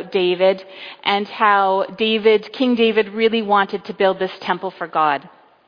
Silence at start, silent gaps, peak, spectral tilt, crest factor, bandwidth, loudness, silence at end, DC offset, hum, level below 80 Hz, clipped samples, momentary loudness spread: 0 s; none; -2 dBFS; -6.5 dB/octave; 16 dB; 5.2 kHz; -18 LUFS; 0.4 s; under 0.1%; none; -66 dBFS; under 0.1%; 8 LU